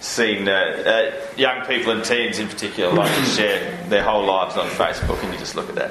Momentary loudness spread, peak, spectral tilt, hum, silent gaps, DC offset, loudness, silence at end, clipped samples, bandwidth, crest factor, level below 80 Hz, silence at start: 7 LU; -2 dBFS; -3.5 dB/octave; none; none; under 0.1%; -20 LUFS; 0 s; under 0.1%; 13.5 kHz; 20 dB; -40 dBFS; 0 s